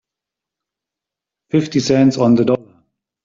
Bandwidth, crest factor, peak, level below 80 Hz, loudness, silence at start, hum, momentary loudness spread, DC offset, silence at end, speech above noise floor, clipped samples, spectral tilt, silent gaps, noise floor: 7.6 kHz; 16 dB; -2 dBFS; -56 dBFS; -15 LUFS; 1.55 s; none; 7 LU; under 0.1%; 0.65 s; 72 dB; under 0.1%; -6.5 dB/octave; none; -85 dBFS